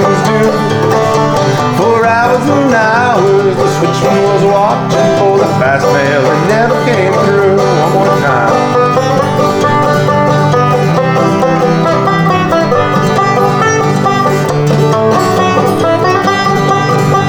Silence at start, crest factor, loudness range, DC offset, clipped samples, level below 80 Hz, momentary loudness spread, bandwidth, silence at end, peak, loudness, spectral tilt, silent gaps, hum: 0 s; 8 dB; 1 LU; under 0.1%; under 0.1%; -42 dBFS; 2 LU; 19.5 kHz; 0 s; 0 dBFS; -9 LUFS; -6 dB/octave; none; none